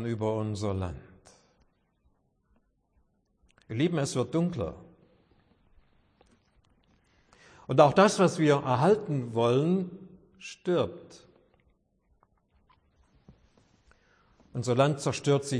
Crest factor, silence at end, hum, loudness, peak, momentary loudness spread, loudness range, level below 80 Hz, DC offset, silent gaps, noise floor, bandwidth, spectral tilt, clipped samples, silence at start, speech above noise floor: 24 dB; 0 s; none; -27 LUFS; -6 dBFS; 18 LU; 14 LU; -62 dBFS; under 0.1%; none; -70 dBFS; 10.5 kHz; -6 dB/octave; under 0.1%; 0 s; 44 dB